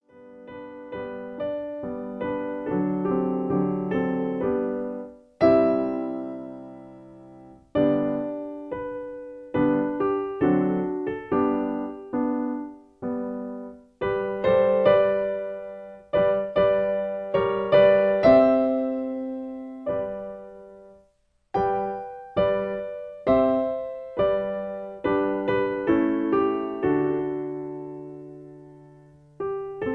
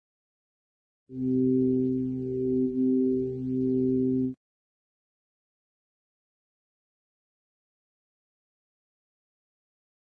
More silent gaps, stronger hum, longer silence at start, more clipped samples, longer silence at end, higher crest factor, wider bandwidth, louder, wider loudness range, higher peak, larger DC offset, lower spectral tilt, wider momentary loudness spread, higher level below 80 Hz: neither; neither; second, 0.15 s vs 1.1 s; neither; second, 0 s vs 5.75 s; first, 20 dB vs 14 dB; first, 5.8 kHz vs 0.8 kHz; about the same, -25 LUFS vs -27 LUFS; about the same, 8 LU vs 7 LU; first, -6 dBFS vs -16 dBFS; neither; second, -9.5 dB/octave vs -13 dB/octave; first, 18 LU vs 8 LU; about the same, -56 dBFS vs -60 dBFS